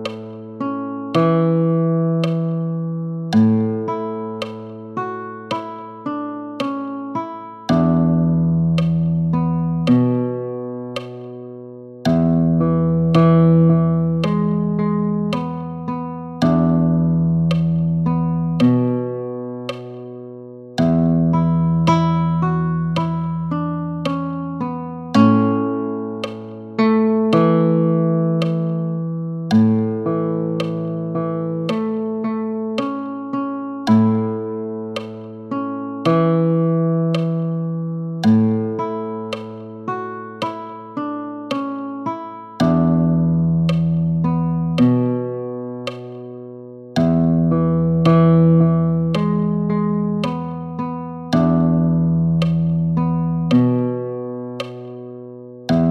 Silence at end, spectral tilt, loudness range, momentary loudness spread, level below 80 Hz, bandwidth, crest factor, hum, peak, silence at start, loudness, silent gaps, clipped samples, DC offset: 0 s; -9 dB/octave; 6 LU; 14 LU; -46 dBFS; 6.4 kHz; 18 dB; none; 0 dBFS; 0 s; -19 LUFS; none; under 0.1%; under 0.1%